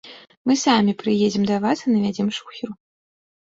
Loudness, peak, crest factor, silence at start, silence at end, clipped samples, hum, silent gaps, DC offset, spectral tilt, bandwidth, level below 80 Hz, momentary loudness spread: -20 LUFS; -4 dBFS; 18 dB; 0.05 s; 0.75 s; under 0.1%; none; 0.37-0.45 s; under 0.1%; -5 dB/octave; 7.8 kHz; -62 dBFS; 14 LU